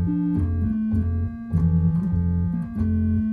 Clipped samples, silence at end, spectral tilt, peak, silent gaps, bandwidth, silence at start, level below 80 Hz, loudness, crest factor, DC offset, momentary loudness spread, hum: under 0.1%; 0 s; -12 dB/octave; -10 dBFS; none; 2.5 kHz; 0 s; -34 dBFS; -23 LUFS; 10 dB; under 0.1%; 5 LU; none